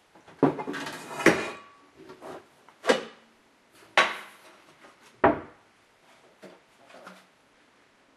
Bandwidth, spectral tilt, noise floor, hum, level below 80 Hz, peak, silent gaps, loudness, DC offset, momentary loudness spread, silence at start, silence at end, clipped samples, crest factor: 13.5 kHz; -4 dB/octave; -61 dBFS; none; -62 dBFS; -2 dBFS; none; -27 LUFS; under 0.1%; 25 LU; 0.4 s; 1.05 s; under 0.1%; 30 dB